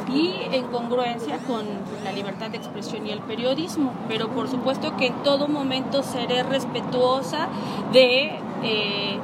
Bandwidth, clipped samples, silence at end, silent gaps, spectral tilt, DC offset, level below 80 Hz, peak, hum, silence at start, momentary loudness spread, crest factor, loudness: 14.5 kHz; under 0.1%; 0 s; none; -5 dB/octave; under 0.1%; -66 dBFS; -2 dBFS; none; 0 s; 10 LU; 22 dB; -24 LUFS